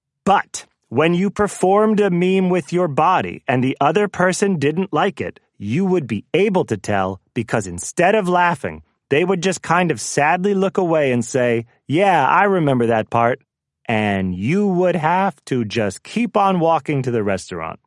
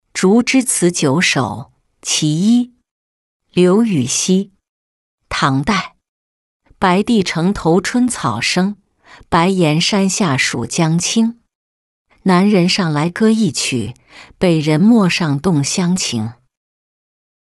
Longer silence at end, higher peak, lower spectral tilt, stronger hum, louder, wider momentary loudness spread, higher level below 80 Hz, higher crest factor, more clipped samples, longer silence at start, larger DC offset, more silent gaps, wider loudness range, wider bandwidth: second, 0.15 s vs 1.15 s; about the same, -2 dBFS vs -2 dBFS; about the same, -5.5 dB/octave vs -4.5 dB/octave; neither; second, -18 LUFS vs -15 LUFS; about the same, 8 LU vs 9 LU; second, -56 dBFS vs -46 dBFS; about the same, 16 dB vs 14 dB; neither; about the same, 0.25 s vs 0.15 s; neither; second, none vs 2.91-3.40 s, 4.69-5.18 s, 6.09-6.60 s, 11.55-12.05 s; about the same, 3 LU vs 2 LU; about the same, 12 kHz vs 12 kHz